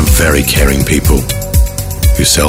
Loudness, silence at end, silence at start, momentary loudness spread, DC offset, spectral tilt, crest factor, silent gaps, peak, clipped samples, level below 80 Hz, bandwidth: -11 LUFS; 0 s; 0 s; 5 LU; under 0.1%; -4 dB/octave; 10 dB; none; 0 dBFS; under 0.1%; -14 dBFS; 16.5 kHz